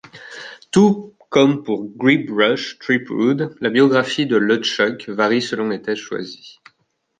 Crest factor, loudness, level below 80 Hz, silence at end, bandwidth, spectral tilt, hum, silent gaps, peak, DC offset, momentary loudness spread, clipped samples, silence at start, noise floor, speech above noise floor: 16 dB; -18 LUFS; -62 dBFS; 0.7 s; 9.4 kHz; -5.5 dB/octave; none; none; -2 dBFS; under 0.1%; 13 LU; under 0.1%; 0.15 s; -67 dBFS; 49 dB